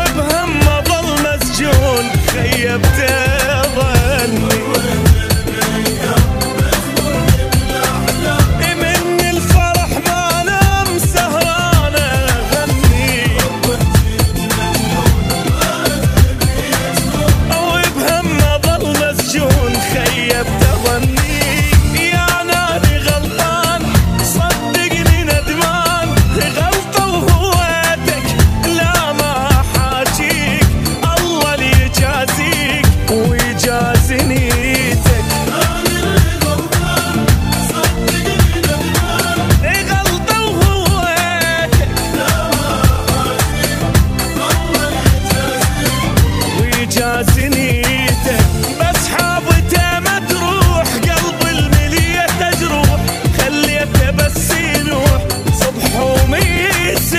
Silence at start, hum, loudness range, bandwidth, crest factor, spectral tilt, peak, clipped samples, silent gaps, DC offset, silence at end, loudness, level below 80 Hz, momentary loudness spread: 0 s; none; 1 LU; 16 kHz; 12 dB; -4.5 dB/octave; 0 dBFS; under 0.1%; none; under 0.1%; 0 s; -13 LUFS; -20 dBFS; 3 LU